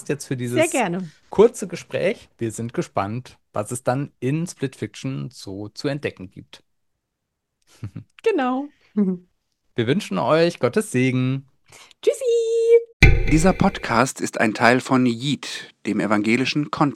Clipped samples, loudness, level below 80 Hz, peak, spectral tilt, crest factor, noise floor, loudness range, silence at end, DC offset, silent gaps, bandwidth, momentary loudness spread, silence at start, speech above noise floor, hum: under 0.1%; -21 LUFS; -32 dBFS; 0 dBFS; -5.5 dB/octave; 22 dB; -79 dBFS; 11 LU; 0 s; under 0.1%; 12.93-13.00 s; 14 kHz; 14 LU; 0.1 s; 57 dB; none